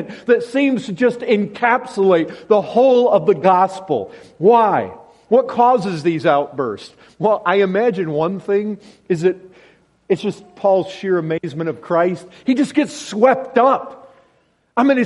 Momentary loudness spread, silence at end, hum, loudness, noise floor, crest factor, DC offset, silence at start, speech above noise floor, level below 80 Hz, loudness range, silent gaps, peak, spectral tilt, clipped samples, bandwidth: 10 LU; 0 s; none; -17 LUFS; -59 dBFS; 16 dB; under 0.1%; 0 s; 43 dB; -64 dBFS; 5 LU; none; 0 dBFS; -6.5 dB/octave; under 0.1%; 11.5 kHz